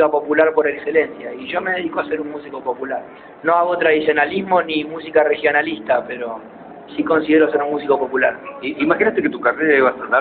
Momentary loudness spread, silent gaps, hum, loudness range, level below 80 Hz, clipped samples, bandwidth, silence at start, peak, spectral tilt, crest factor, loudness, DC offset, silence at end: 13 LU; none; none; 3 LU; -58 dBFS; under 0.1%; 4.5 kHz; 0 s; -2 dBFS; -2.5 dB/octave; 16 dB; -18 LUFS; under 0.1%; 0 s